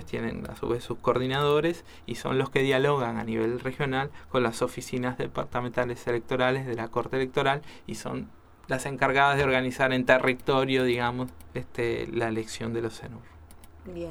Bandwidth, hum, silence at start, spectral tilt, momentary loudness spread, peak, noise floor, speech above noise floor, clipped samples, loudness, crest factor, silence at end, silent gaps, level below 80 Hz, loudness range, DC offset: 17 kHz; none; 0 s; -5.5 dB/octave; 14 LU; -4 dBFS; -48 dBFS; 21 dB; under 0.1%; -27 LUFS; 24 dB; 0 s; none; -52 dBFS; 5 LU; under 0.1%